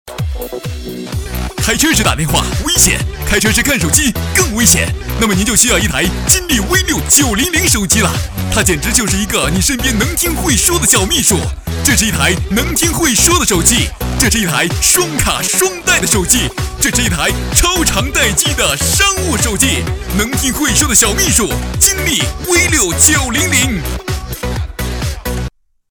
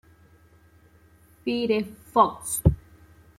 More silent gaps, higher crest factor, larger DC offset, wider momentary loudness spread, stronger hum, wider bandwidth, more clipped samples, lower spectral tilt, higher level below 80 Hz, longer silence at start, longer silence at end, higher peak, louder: neither; second, 14 dB vs 24 dB; neither; about the same, 11 LU vs 10 LU; neither; first, over 20 kHz vs 16 kHz; neither; second, -2.5 dB/octave vs -5.5 dB/octave; first, -22 dBFS vs -40 dBFS; second, 0.05 s vs 1.45 s; second, 0.4 s vs 0.6 s; first, 0 dBFS vs -4 dBFS; first, -11 LUFS vs -25 LUFS